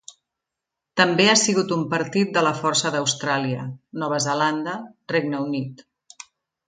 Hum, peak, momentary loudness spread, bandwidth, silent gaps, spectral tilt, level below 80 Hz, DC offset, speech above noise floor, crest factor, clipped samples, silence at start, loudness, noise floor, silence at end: none; 0 dBFS; 14 LU; 9.6 kHz; none; -3.5 dB/octave; -68 dBFS; under 0.1%; 63 dB; 22 dB; under 0.1%; 0.95 s; -21 LUFS; -85 dBFS; 0.9 s